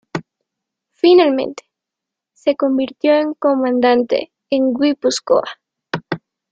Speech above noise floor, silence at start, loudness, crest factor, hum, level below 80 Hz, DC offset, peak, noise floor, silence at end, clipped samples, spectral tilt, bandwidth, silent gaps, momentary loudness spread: 69 dB; 0.15 s; -16 LUFS; 16 dB; none; -62 dBFS; under 0.1%; -2 dBFS; -83 dBFS; 0.35 s; under 0.1%; -4.5 dB/octave; 9.2 kHz; none; 16 LU